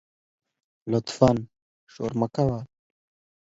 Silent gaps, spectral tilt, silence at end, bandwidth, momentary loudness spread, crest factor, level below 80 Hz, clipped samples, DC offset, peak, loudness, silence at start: 1.62-1.87 s; -7 dB/octave; 0.85 s; 8 kHz; 20 LU; 24 dB; -52 dBFS; under 0.1%; under 0.1%; -4 dBFS; -26 LUFS; 0.85 s